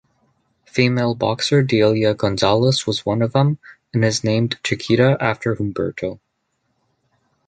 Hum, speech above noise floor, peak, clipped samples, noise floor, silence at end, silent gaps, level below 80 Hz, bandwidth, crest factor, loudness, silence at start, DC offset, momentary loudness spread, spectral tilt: none; 53 dB; -2 dBFS; under 0.1%; -71 dBFS; 1.35 s; none; -50 dBFS; 9.4 kHz; 18 dB; -19 LUFS; 0.75 s; under 0.1%; 9 LU; -5.5 dB/octave